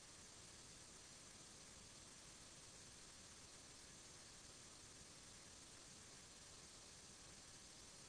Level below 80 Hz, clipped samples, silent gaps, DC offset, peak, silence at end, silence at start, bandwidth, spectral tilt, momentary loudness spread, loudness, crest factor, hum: -76 dBFS; under 0.1%; none; under 0.1%; -48 dBFS; 0 s; 0 s; 11 kHz; -1.5 dB/octave; 0 LU; -59 LUFS; 12 dB; none